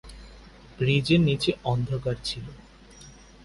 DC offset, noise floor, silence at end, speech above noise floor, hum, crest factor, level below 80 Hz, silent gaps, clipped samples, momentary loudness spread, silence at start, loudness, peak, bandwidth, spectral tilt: under 0.1%; -49 dBFS; 0.3 s; 24 dB; none; 18 dB; -48 dBFS; none; under 0.1%; 16 LU; 0.05 s; -25 LUFS; -10 dBFS; 11.5 kHz; -6.5 dB/octave